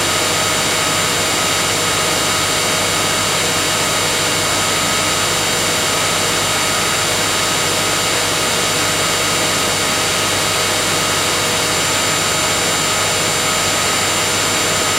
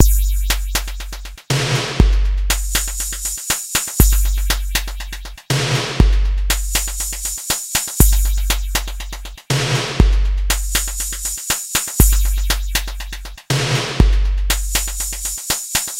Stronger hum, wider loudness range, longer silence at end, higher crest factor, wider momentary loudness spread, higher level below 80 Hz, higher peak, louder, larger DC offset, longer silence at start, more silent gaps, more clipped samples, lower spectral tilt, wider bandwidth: first, 50 Hz at -35 dBFS vs none; about the same, 0 LU vs 2 LU; about the same, 0 s vs 0 s; second, 12 dB vs 18 dB; second, 0 LU vs 11 LU; second, -42 dBFS vs -18 dBFS; second, -4 dBFS vs 0 dBFS; first, -14 LUFS vs -18 LUFS; neither; about the same, 0 s vs 0 s; neither; neither; second, -1.5 dB/octave vs -3 dB/octave; about the same, 16 kHz vs 17 kHz